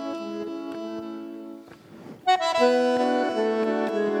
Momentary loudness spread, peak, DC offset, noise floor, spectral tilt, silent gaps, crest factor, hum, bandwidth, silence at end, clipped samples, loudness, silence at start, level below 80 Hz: 20 LU; -8 dBFS; under 0.1%; -45 dBFS; -4.5 dB/octave; none; 18 dB; none; 13.5 kHz; 0 s; under 0.1%; -25 LUFS; 0 s; -74 dBFS